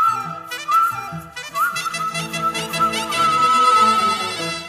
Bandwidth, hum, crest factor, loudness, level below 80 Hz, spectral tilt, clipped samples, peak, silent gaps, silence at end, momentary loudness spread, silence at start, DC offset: 15.5 kHz; none; 16 dB; -18 LUFS; -56 dBFS; -2.5 dB/octave; under 0.1%; -4 dBFS; none; 0 s; 15 LU; 0 s; under 0.1%